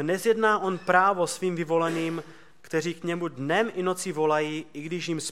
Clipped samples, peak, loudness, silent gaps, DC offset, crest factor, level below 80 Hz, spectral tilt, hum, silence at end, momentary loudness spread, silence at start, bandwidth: under 0.1%; -6 dBFS; -26 LUFS; none; 0.3%; 20 dB; -74 dBFS; -4.5 dB/octave; none; 0 s; 10 LU; 0 s; 16 kHz